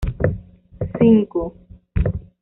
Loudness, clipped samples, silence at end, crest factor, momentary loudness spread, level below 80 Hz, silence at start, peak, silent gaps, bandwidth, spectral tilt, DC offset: -20 LUFS; under 0.1%; 0.2 s; 18 dB; 16 LU; -30 dBFS; 0 s; -2 dBFS; none; 3.7 kHz; -9.5 dB/octave; under 0.1%